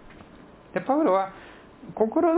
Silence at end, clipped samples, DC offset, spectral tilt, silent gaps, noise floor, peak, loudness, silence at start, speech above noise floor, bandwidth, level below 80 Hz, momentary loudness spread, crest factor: 0 s; under 0.1%; under 0.1%; -10.5 dB/octave; none; -49 dBFS; -10 dBFS; -25 LUFS; 0.75 s; 26 dB; 4 kHz; -60 dBFS; 24 LU; 16 dB